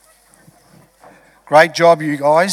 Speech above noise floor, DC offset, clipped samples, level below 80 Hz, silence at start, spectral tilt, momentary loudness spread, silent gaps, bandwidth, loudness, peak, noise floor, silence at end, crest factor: 38 dB; under 0.1%; under 0.1%; -64 dBFS; 1.5 s; -4.5 dB/octave; 4 LU; none; 14.5 kHz; -13 LUFS; 0 dBFS; -49 dBFS; 0 s; 16 dB